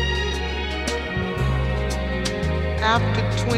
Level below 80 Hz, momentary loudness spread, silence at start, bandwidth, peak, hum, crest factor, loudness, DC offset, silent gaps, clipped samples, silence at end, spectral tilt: -28 dBFS; 5 LU; 0 s; 13 kHz; -6 dBFS; none; 16 dB; -23 LUFS; under 0.1%; none; under 0.1%; 0 s; -5 dB/octave